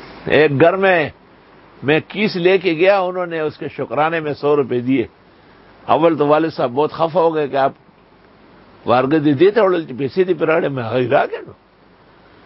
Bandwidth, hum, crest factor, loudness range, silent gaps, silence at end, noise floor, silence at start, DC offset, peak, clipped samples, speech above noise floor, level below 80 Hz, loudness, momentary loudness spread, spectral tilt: 5.8 kHz; none; 18 dB; 2 LU; none; 0.95 s; -49 dBFS; 0 s; under 0.1%; 0 dBFS; under 0.1%; 33 dB; -56 dBFS; -16 LUFS; 10 LU; -10 dB/octave